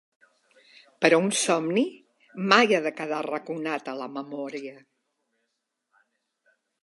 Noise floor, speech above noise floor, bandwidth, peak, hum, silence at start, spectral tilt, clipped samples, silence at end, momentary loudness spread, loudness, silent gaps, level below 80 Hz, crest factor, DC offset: -79 dBFS; 55 dB; 11.5 kHz; -2 dBFS; none; 1 s; -3.5 dB/octave; under 0.1%; 2.1 s; 15 LU; -25 LUFS; none; -82 dBFS; 26 dB; under 0.1%